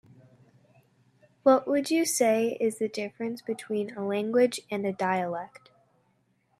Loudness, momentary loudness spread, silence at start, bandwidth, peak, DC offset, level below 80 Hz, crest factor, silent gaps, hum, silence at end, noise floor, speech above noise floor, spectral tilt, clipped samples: -27 LUFS; 11 LU; 1.45 s; 14.5 kHz; -8 dBFS; under 0.1%; -78 dBFS; 20 dB; none; none; 1.15 s; -70 dBFS; 43 dB; -4 dB/octave; under 0.1%